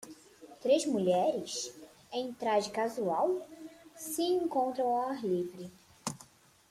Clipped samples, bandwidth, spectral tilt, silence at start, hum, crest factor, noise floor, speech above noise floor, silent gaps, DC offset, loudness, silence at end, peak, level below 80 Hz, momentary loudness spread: under 0.1%; 15.5 kHz; -4.5 dB/octave; 0 s; none; 18 dB; -59 dBFS; 28 dB; none; under 0.1%; -33 LUFS; 0.45 s; -16 dBFS; -76 dBFS; 20 LU